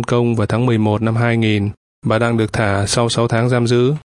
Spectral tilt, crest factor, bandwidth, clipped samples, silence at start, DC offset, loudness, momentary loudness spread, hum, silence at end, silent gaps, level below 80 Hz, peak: -6 dB/octave; 14 dB; 11.5 kHz; under 0.1%; 0 s; under 0.1%; -16 LUFS; 3 LU; none; 0.1 s; 1.77-2.02 s; -46 dBFS; 0 dBFS